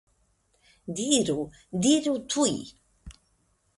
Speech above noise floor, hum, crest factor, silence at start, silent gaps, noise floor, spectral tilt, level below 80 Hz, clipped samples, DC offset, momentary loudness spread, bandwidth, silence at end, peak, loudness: 43 dB; none; 20 dB; 0.85 s; none; -69 dBFS; -3.5 dB/octave; -58 dBFS; under 0.1%; under 0.1%; 14 LU; 11.5 kHz; 0.65 s; -8 dBFS; -26 LUFS